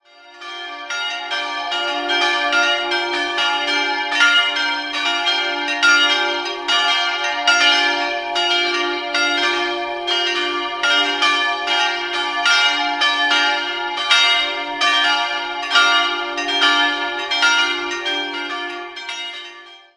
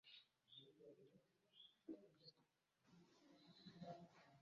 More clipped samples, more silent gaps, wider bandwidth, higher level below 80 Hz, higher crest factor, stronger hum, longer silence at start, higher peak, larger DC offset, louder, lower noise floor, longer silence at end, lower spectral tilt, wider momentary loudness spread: neither; neither; first, 11.5 kHz vs 7.2 kHz; first, -62 dBFS vs under -90 dBFS; about the same, 18 dB vs 22 dB; neither; first, 0.25 s vs 0.05 s; first, 0 dBFS vs -44 dBFS; neither; first, -16 LUFS vs -64 LUFS; second, -40 dBFS vs -85 dBFS; first, 0.2 s vs 0 s; second, 0.5 dB/octave vs -4.5 dB/octave; about the same, 10 LU vs 9 LU